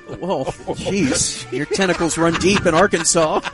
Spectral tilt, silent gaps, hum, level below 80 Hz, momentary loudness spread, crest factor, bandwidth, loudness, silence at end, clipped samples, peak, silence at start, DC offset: -3.5 dB/octave; none; none; -42 dBFS; 10 LU; 16 dB; 11.5 kHz; -18 LUFS; 0 s; under 0.1%; -2 dBFS; 0.05 s; under 0.1%